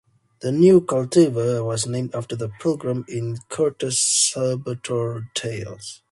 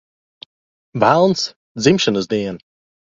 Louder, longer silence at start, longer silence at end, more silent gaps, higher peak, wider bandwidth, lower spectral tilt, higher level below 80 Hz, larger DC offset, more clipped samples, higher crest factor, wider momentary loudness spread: second, -21 LUFS vs -17 LUFS; second, 0.4 s vs 0.95 s; second, 0.15 s vs 0.55 s; second, none vs 1.56-1.75 s; second, -4 dBFS vs 0 dBFS; first, 11.5 kHz vs 7.8 kHz; about the same, -4.5 dB/octave vs -5 dB/octave; second, -60 dBFS vs -54 dBFS; neither; neither; about the same, 18 dB vs 18 dB; about the same, 13 LU vs 15 LU